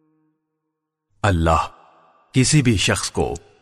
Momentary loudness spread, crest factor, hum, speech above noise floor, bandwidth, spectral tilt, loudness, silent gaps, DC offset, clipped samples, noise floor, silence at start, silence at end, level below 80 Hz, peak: 9 LU; 16 dB; none; 60 dB; 13 kHz; -4.5 dB/octave; -19 LUFS; none; under 0.1%; under 0.1%; -79 dBFS; 1.25 s; 0.25 s; -36 dBFS; -6 dBFS